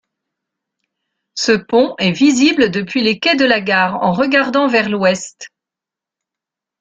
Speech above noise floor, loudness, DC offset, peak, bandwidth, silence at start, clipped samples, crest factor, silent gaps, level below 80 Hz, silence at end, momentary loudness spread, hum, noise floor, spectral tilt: 72 dB; -14 LUFS; under 0.1%; 0 dBFS; 9 kHz; 1.35 s; under 0.1%; 16 dB; none; -56 dBFS; 1.35 s; 4 LU; none; -86 dBFS; -4 dB/octave